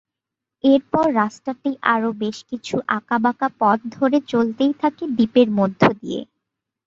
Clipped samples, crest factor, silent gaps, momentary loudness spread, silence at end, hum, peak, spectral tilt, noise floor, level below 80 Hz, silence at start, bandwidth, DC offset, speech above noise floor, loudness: under 0.1%; 18 dB; none; 10 LU; 0.65 s; none; -2 dBFS; -6.5 dB/octave; -85 dBFS; -58 dBFS; 0.65 s; 7.6 kHz; under 0.1%; 66 dB; -20 LUFS